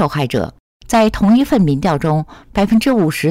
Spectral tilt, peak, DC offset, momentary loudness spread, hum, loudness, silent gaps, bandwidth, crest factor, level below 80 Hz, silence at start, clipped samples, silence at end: -6.5 dB/octave; -6 dBFS; 0.3%; 8 LU; none; -15 LUFS; 0.60-0.80 s; 16 kHz; 8 dB; -36 dBFS; 0 s; under 0.1%; 0 s